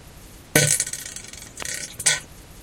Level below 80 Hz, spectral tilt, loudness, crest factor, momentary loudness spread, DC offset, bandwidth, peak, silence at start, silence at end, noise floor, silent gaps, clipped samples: -50 dBFS; -2 dB/octave; -22 LUFS; 26 dB; 16 LU; under 0.1%; 17 kHz; 0 dBFS; 0.05 s; 0 s; -44 dBFS; none; under 0.1%